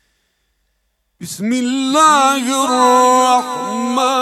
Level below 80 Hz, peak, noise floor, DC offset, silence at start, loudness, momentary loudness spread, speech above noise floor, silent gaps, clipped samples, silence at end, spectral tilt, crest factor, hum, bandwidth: -66 dBFS; 0 dBFS; -66 dBFS; under 0.1%; 1.2 s; -13 LUFS; 11 LU; 53 dB; none; under 0.1%; 0 s; -2.5 dB/octave; 14 dB; none; 15.5 kHz